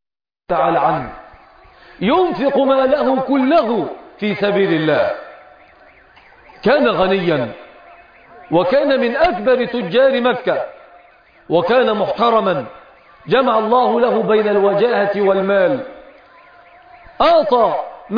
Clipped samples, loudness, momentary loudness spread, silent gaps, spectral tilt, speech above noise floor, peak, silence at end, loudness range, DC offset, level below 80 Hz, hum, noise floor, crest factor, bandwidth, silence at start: under 0.1%; -16 LUFS; 9 LU; none; -8 dB/octave; 33 dB; -2 dBFS; 0 s; 3 LU; under 0.1%; -50 dBFS; none; -48 dBFS; 14 dB; 5.2 kHz; 0.5 s